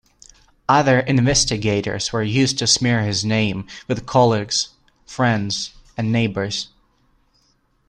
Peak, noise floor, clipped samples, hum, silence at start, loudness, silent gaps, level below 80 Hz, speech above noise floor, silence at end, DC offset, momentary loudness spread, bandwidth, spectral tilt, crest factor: -2 dBFS; -62 dBFS; under 0.1%; none; 0.7 s; -19 LUFS; none; -44 dBFS; 43 dB; 1.25 s; under 0.1%; 11 LU; 10.5 kHz; -4 dB/octave; 18 dB